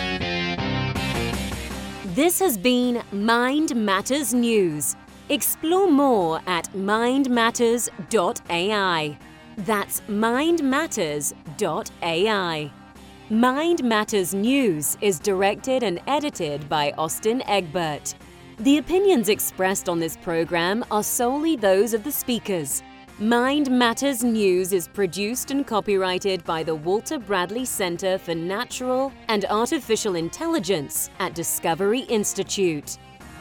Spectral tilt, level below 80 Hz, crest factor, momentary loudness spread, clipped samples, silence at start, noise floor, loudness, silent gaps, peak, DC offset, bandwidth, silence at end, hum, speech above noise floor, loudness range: -3.5 dB/octave; -48 dBFS; 16 dB; 7 LU; under 0.1%; 0 s; -44 dBFS; -23 LUFS; none; -6 dBFS; under 0.1%; 19.5 kHz; 0 s; none; 22 dB; 3 LU